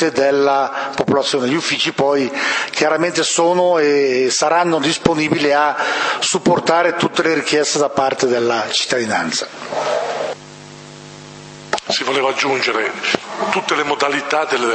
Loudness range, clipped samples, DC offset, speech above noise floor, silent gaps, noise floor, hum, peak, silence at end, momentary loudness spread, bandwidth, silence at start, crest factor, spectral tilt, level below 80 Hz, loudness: 6 LU; under 0.1%; under 0.1%; 20 dB; none; -37 dBFS; none; 0 dBFS; 0 s; 10 LU; 8.8 kHz; 0 s; 16 dB; -3 dB/octave; -56 dBFS; -16 LUFS